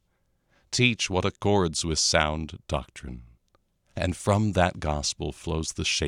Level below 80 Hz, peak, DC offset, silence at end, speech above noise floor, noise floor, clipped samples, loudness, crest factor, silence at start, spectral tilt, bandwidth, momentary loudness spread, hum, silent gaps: -42 dBFS; -4 dBFS; under 0.1%; 0 s; 45 dB; -71 dBFS; under 0.1%; -26 LUFS; 22 dB; 0.7 s; -4 dB/octave; 14.5 kHz; 14 LU; none; none